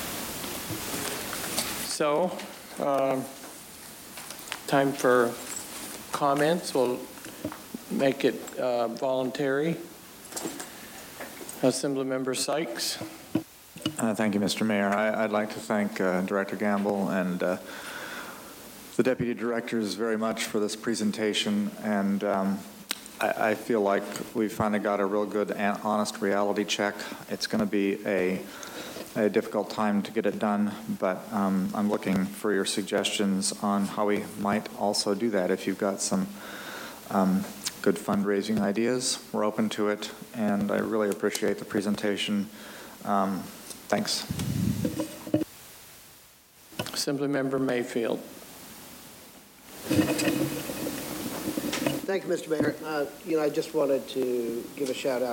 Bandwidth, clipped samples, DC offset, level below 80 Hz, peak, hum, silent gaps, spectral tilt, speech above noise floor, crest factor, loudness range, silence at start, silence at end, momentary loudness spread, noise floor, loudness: 17 kHz; under 0.1%; under 0.1%; -62 dBFS; -10 dBFS; none; none; -4.5 dB/octave; 27 dB; 18 dB; 4 LU; 0 s; 0 s; 13 LU; -54 dBFS; -28 LUFS